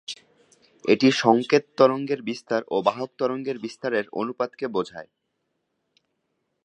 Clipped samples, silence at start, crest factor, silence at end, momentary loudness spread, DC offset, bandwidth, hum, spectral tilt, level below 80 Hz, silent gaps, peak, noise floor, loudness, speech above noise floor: under 0.1%; 0.1 s; 22 dB; 1.6 s; 13 LU; under 0.1%; 10 kHz; none; -5 dB/octave; -74 dBFS; none; -2 dBFS; -76 dBFS; -24 LUFS; 53 dB